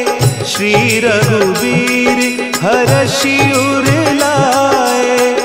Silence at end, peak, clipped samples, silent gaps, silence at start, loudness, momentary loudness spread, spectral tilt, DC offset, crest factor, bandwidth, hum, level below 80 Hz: 0 s; 0 dBFS; under 0.1%; none; 0 s; -11 LUFS; 3 LU; -4.5 dB/octave; under 0.1%; 12 dB; 16.5 kHz; none; -42 dBFS